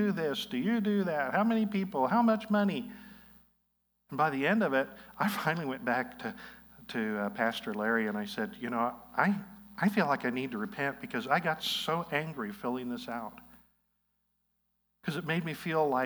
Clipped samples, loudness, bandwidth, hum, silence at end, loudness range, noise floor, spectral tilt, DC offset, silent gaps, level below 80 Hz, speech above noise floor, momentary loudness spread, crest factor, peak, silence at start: under 0.1%; -32 LUFS; over 20 kHz; 60 Hz at -65 dBFS; 0 s; 6 LU; -78 dBFS; -6 dB/octave; under 0.1%; none; -70 dBFS; 47 dB; 11 LU; 22 dB; -10 dBFS; 0 s